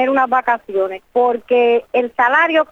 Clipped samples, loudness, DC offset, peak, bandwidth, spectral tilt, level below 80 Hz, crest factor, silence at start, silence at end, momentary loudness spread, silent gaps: under 0.1%; -16 LUFS; under 0.1%; -2 dBFS; 6.6 kHz; -5 dB/octave; -60 dBFS; 12 dB; 0 s; 0.05 s; 7 LU; none